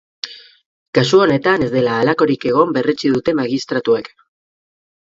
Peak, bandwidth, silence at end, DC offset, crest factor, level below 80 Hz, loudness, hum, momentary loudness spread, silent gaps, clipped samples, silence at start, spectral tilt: 0 dBFS; 7.8 kHz; 0.95 s; under 0.1%; 16 dB; -54 dBFS; -16 LUFS; none; 7 LU; 0.66-0.93 s; under 0.1%; 0.25 s; -6 dB/octave